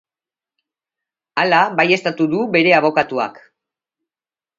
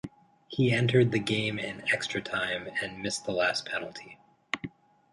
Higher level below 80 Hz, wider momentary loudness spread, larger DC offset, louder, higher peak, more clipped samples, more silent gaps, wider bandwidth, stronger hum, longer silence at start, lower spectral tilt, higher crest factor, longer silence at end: about the same, -68 dBFS vs -64 dBFS; second, 10 LU vs 14 LU; neither; first, -16 LUFS vs -29 LUFS; first, 0 dBFS vs -10 dBFS; neither; neither; second, 7.8 kHz vs 11.5 kHz; neither; first, 1.35 s vs 0.05 s; about the same, -5.5 dB/octave vs -5 dB/octave; about the same, 20 dB vs 20 dB; first, 1.2 s vs 0.45 s